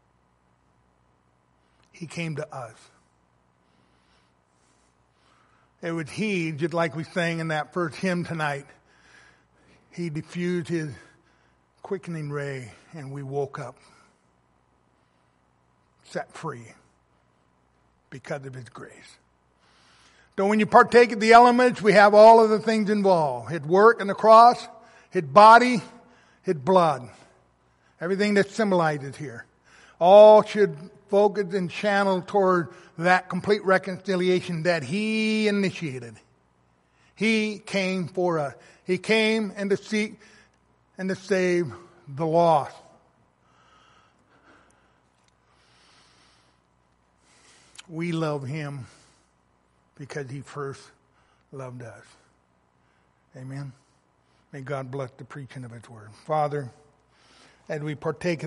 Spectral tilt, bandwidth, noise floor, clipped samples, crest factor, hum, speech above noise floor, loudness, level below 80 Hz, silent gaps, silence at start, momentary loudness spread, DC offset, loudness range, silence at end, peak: -6 dB/octave; 11.5 kHz; -66 dBFS; under 0.1%; 22 dB; none; 44 dB; -21 LUFS; -68 dBFS; none; 2 s; 24 LU; under 0.1%; 23 LU; 0 s; -2 dBFS